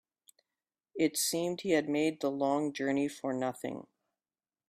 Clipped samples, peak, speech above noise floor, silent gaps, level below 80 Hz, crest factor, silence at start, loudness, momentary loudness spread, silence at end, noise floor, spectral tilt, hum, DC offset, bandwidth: under 0.1%; -16 dBFS; over 58 dB; none; -76 dBFS; 18 dB; 0.95 s; -32 LUFS; 11 LU; 0.9 s; under -90 dBFS; -4 dB/octave; none; under 0.1%; 15.5 kHz